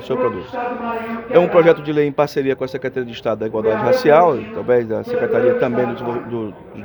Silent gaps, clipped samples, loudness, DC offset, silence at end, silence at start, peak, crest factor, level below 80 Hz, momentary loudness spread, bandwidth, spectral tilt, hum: none; under 0.1%; -18 LUFS; under 0.1%; 0 s; 0 s; 0 dBFS; 18 dB; -54 dBFS; 12 LU; over 20 kHz; -7 dB/octave; none